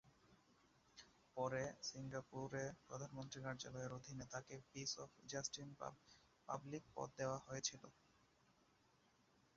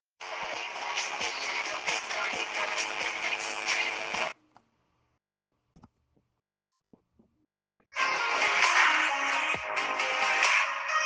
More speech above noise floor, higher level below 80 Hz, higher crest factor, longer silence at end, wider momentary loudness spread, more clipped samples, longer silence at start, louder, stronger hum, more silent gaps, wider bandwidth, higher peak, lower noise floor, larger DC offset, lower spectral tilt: second, 27 dB vs 53 dB; about the same, -78 dBFS vs -74 dBFS; about the same, 24 dB vs 22 dB; first, 1.65 s vs 0 s; first, 18 LU vs 11 LU; neither; second, 0.05 s vs 0.2 s; second, -50 LUFS vs -28 LUFS; neither; neither; second, 7.4 kHz vs 10.5 kHz; second, -28 dBFS vs -10 dBFS; second, -77 dBFS vs -85 dBFS; neither; first, -4 dB/octave vs 0.5 dB/octave